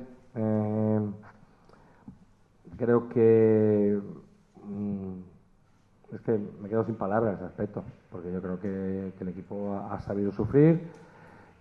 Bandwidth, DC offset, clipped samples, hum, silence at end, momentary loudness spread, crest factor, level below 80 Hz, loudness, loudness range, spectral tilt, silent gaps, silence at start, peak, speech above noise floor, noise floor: 5.2 kHz; under 0.1%; under 0.1%; none; 0.3 s; 19 LU; 20 dB; -62 dBFS; -28 LUFS; 7 LU; -11.5 dB/octave; none; 0 s; -10 dBFS; 35 dB; -62 dBFS